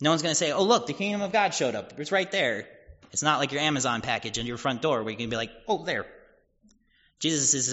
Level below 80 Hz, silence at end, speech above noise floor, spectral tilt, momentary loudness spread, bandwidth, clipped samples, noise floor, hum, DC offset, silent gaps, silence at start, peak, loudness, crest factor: -60 dBFS; 0 s; 38 dB; -2.5 dB/octave; 9 LU; 8 kHz; under 0.1%; -65 dBFS; none; under 0.1%; none; 0 s; -8 dBFS; -26 LUFS; 20 dB